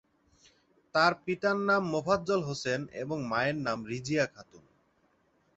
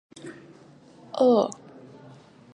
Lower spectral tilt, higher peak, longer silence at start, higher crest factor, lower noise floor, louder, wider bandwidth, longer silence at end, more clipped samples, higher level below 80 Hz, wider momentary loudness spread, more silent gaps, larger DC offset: about the same, -5 dB/octave vs -6 dB/octave; about the same, -10 dBFS vs -8 dBFS; first, 0.95 s vs 0.25 s; about the same, 20 dB vs 20 dB; first, -70 dBFS vs -52 dBFS; second, -30 LUFS vs -23 LUFS; second, 8.2 kHz vs 10 kHz; about the same, 0.95 s vs 1.05 s; neither; first, -66 dBFS vs -76 dBFS; second, 8 LU vs 26 LU; neither; neither